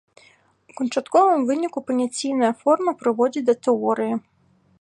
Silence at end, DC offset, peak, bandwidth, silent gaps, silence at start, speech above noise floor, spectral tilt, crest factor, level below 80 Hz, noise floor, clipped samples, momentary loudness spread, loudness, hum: 0.6 s; under 0.1%; -4 dBFS; 11 kHz; none; 0.8 s; 36 dB; -4.5 dB/octave; 16 dB; -74 dBFS; -56 dBFS; under 0.1%; 8 LU; -21 LUFS; none